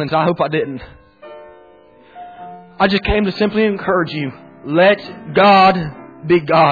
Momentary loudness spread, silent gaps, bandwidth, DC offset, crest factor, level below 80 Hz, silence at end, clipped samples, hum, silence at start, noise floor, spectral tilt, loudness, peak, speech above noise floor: 23 LU; none; 5 kHz; under 0.1%; 14 dB; -38 dBFS; 0 s; under 0.1%; none; 0 s; -46 dBFS; -8 dB/octave; -15 LUFS; -2 dBFS; 31 dB